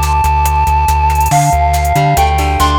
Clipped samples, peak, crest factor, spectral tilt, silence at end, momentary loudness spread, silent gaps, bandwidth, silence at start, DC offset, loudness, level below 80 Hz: under 0.1%; 0 dBFS; 10 dB; -5 dB/octave; 0 s; 1 LU; none; over 20 kHz; 0 s; under 0.1%; -11 LUFS; -16 dBFS